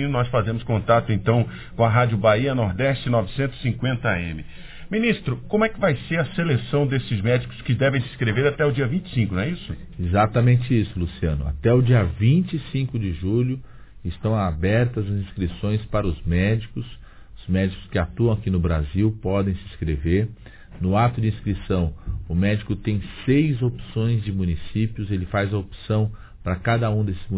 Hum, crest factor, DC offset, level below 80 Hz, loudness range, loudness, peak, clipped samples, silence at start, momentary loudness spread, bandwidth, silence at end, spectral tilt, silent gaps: none; 18 dB; under 0.1%; -36 dBFS; 4 LU; -23 LUFS; -4 dBFS; under 0.1%; 0 s; 9 LU; 4 kHz; 0 s; -11.5 dB/octave; none